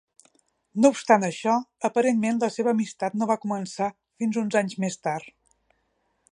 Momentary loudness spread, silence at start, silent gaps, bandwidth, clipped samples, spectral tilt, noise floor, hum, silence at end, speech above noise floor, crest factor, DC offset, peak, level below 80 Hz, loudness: 9 LU; 0.75 s; none; 11 kHz; under 0.1%; -5.5 dB/octave; -72 dBFS; none; 1.05 s; 48 dB; 22 dB; under 0.1%; -4 dBFS; -74 dBFS; -25 LUFS